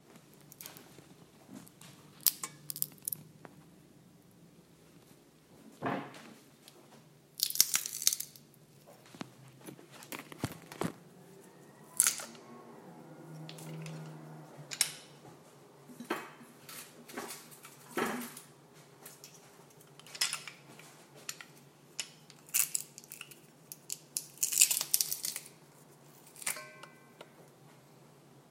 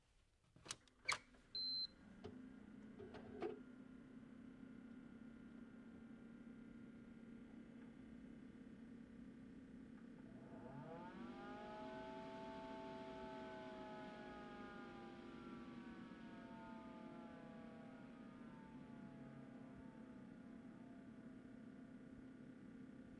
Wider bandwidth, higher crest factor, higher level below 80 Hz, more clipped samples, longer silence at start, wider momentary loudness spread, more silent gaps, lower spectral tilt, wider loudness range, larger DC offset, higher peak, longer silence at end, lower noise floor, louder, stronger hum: first, 16 kHz vs 10 kHz; first, 40 dB vs 28 dB; about the same, -80 dBFS vs -76 dBFS; neither; about the same, 0.1 s vs 0 s; first, 27 LU vs 9 LU; neither; second, -1 dB/octave vs -4 dB/octave; first, 13 LU vs 10 LU; neither; first, 0 dBFS vs -28 dBFS; about the same, 0.1 s vs 0 s; second, -61 dBFS vs -77 dBFS; first, -34 LUFS vs -55 LUFS; neither